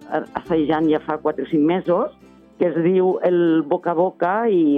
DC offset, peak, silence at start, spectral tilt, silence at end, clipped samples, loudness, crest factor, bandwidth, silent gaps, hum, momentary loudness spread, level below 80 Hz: under 0.1%; -6 dBFS; 0 s; -9.5 dB/octave; 0 s; under 0.1%; -20 LUFS; 12 dB; 4.5 kHz; none; none; 6 LU; -58 dBFS